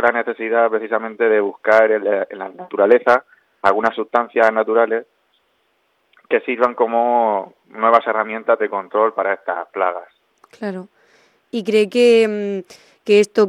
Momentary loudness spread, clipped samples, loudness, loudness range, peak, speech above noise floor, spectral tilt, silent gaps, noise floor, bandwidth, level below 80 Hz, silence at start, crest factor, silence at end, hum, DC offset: 14 LU; under 0.1%; -17 LUFS; 4 LU; 0 dBFS; 48 dB; -5 dB/octave; none; -64 dBFS; 11 kHz; -68 dBFS; 0 s; 18 dB; 0 s; none; under 0.1%